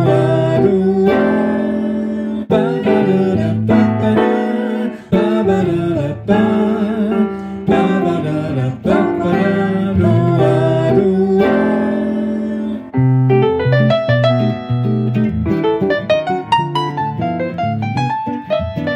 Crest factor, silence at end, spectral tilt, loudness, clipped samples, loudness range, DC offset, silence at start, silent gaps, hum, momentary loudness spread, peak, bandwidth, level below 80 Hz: 12 dB; 0 s; -8.5 dB/octave; -15 LUFS; under 0.1%; 2 LU; under 0.1%; 0 s; none; none; 7 LU; -2 dBFS; 9.4 kHz; -42 dBFS